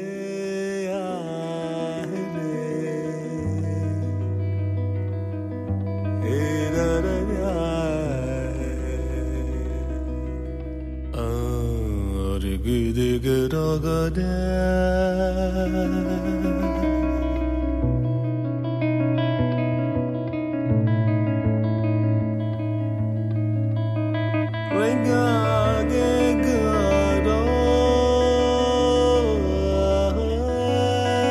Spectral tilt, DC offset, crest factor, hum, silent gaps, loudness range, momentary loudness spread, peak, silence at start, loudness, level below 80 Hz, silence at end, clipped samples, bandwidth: -7 dB/octave; under 0.1%; 14 dB; none; none; 8 LU; 9 LU; -8 dBFS; 0 s; -23 LUFS; -32 dBFS; 0 s; under 0.1%; 14 kHz